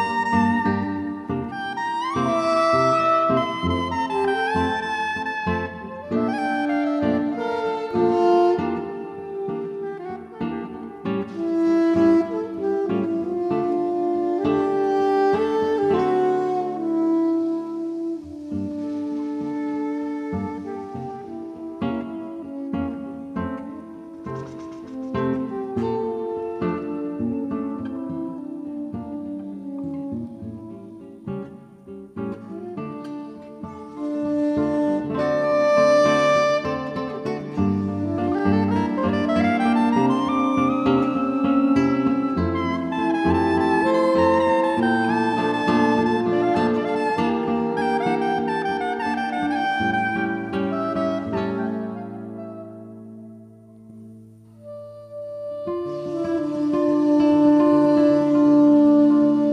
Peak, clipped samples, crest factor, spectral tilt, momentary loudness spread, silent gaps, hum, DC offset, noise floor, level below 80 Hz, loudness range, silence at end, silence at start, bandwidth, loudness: -6 dBFS; under 0.1%; 16 dB; -7 dB/octave; 16 LU; none; none; under 0.1%; -45 dBFS; -58 dBFS; 12 LU; 0 s; 0 s; 10.5 kHz; -22 LUFS